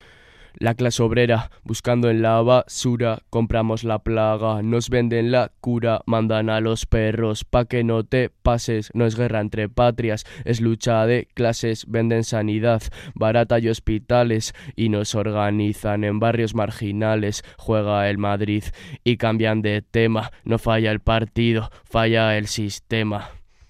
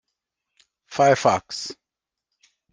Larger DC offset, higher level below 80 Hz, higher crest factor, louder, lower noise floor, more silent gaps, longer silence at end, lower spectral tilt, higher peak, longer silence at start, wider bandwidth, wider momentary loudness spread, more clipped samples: neither; first, -38 dBFS vs -66 dBFS; about the same, 18 dB vs 22 dB; about the same, -21 LUFS vs -21 LUFS; second, -48 dBFS vs -87 dBFS; neither; second, 0.3 s vs 1 s; first, -6 dB/octave vs -4 dB/octave; about the same, -2 dBFS vs -4 dBFS; second, 0.6 s vs 0.9 s; first, 14 kHz vs 10 kHz; second, 6 LU vs 16 LU; neither